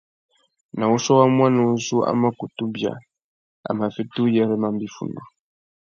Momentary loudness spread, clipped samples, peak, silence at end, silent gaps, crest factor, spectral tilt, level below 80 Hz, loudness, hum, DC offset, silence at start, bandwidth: 16 LU; under 0.1%; -2 dBFS; 0.7 s; 3.24-3.63 s; 20 dB; -6 dB/octave; -66 dBFS; -21 LUFS; none; under 0.1%; 0.75 s; 7.4 kHz